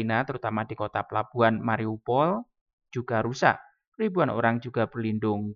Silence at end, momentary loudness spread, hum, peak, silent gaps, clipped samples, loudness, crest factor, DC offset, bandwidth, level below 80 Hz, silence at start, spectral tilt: 0 s; 7 LU; none; -6 dBFS; 2.61-2.66 s, 2.73-2.78 s, 3.87-3.92 s; under 0.1%; -27 LUFS; 22 dB; under 0.1%; 7.4 kHz; -66 dBFS; 0 s; -7 dB/octave